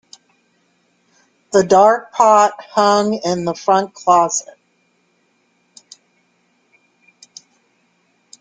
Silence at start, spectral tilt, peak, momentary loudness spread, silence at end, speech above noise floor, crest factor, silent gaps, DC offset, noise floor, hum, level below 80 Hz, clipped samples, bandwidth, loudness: 1.55 s; -4 dB/octave; 0 dBFS; 8 LU; 4 s; 48 dB; 18 dB; none; under 0.1%; -62 dBFS; none; -62 dBFS; under 0.1%; 9.6 kHz; -14 LUFS